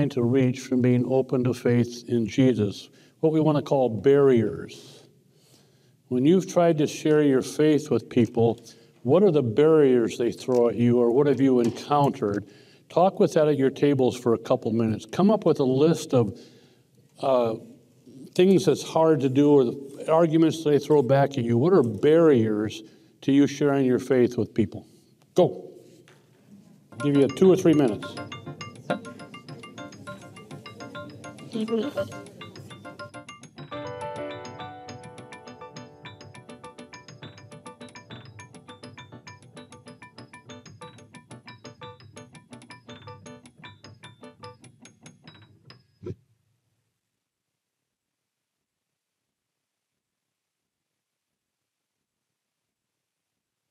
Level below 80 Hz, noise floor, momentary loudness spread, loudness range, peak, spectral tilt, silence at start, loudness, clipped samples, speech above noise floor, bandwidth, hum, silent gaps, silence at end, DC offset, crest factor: -68 dBFS; -84 dBFS; 24 LU; 22 LU; -6 dBFS; -7 dB/octave; 0 s; -22 LUFS; under 0.1%; 62 dB; 14.5 kHz; none; none; 7.55 s; under 0.1%; 18 dB